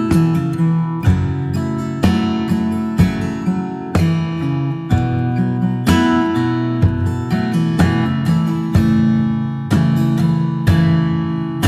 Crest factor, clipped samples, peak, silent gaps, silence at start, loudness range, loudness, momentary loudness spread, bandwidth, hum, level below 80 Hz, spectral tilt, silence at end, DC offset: 14 dB; under 0.1%; -2 dBFS; none; 0 s; 2 LU; -17 LUFS; 6 LU; 14 kHz; none; -34 dBFS; -7.5 dB/octave; 0 s; under 0.1%